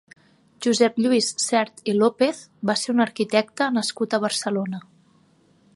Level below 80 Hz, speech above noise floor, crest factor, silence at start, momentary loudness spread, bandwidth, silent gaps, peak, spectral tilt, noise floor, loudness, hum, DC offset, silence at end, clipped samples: -74 dBFS; 37 dB; 20 dB; 0.6 s; 7 LU; 11.5 kHz; none; -4 dBFS; -3.5 dB/octave; -59 dBFS; -22 LUFS; none; under 0.1%; 0.95 s; under 0.1%